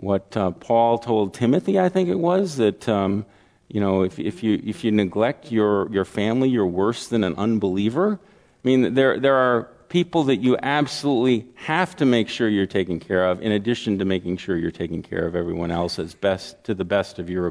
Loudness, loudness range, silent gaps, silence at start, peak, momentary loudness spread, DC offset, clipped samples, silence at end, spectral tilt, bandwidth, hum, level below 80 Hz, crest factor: -22 LUFS; 3 LU; none; 0 s; -4 dBFS; 7 LU; under 0.1%; under 0.1%; 0 s; -6.5 dB/octave; 11 kHz; none; -54 dBFS; 18 dB